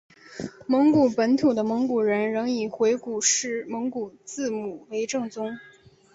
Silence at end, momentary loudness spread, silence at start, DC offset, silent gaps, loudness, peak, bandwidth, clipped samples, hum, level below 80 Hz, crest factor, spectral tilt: 0.5 s; 14 LU; 0.3 s; under 0.1%; none; -24 LUFS; -8 dBFS; 8 kHz; under 0.1%; none; -66 dBFS; 16 dB; -3.5 dB/octave